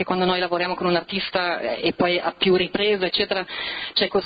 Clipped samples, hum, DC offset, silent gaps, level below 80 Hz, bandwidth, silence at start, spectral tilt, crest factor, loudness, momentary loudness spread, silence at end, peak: under 0.1%; none; under 0.1%; none; -54 dBFS; 5 kHz; 0 s; -8.5 dB/octave; 16 dB; -22 LUFS; 5 LU; 0 s; -6 dBFS